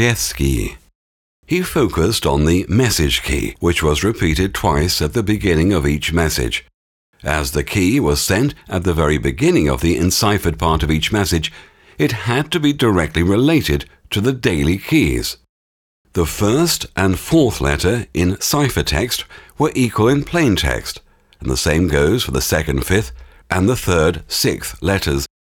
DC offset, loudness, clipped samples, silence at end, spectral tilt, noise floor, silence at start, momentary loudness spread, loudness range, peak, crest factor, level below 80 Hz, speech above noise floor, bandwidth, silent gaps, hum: under 0.1%; -17 LUFS; under 0.1%; 0.15 s; -5 dB/octave; under -90 dBFS; 0 s; 7 LU; 2 LU; -2 dBFS; 16 dB; -30 dBFS; over 74 dB; 19.5 kHz; 0.95-1.43 s, 6.74-7.13 s, 15.49-16.05 s; none